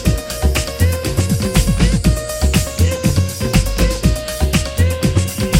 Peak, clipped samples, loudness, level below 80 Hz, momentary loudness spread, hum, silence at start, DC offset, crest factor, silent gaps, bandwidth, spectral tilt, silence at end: 0 dBFS; under 0.1%; -16 LUFS; -20 dBFS; 3 LU; none; 0 s; under 0.1%; 14 dB; none; 17 kHz; -5 dB/octave; 0 s